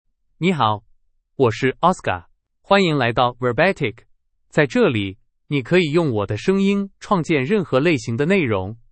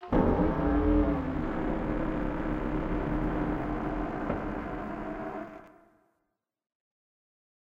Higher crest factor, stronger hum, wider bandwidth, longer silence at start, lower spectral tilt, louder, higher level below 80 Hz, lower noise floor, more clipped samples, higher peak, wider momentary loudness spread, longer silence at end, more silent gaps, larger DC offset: about the same, 20 dB vs 20 dB; neither; first, 8.8 kHz vs 6 kHz; first, 0.4 s vs 0 s; second, -6.5 dB/octave vs -9.5 dB/octave; first, -19 LUFS vs -31 LUFS; second, -52 dBFS vs -38 dBFS; second, -58 dBFS vs -82 dBFS; neither; first, 0 dBFS vs -12 dBFS; second, 8 LU vs 11 LU; second, 0.15 s vs 2 s; neither; neither